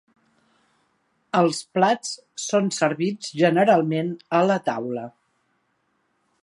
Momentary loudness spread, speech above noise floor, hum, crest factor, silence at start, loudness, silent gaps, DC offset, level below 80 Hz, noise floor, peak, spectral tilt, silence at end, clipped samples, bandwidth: 12 LU; 49 dB; none; 20 dB; 1.35 s; -22 LUFS; none; under 0.1%; -74 dBFS; -70 dBFS; -4 dBFS; -5 dB/octave; 1.35 s; under 0.1%; 11.5 kHz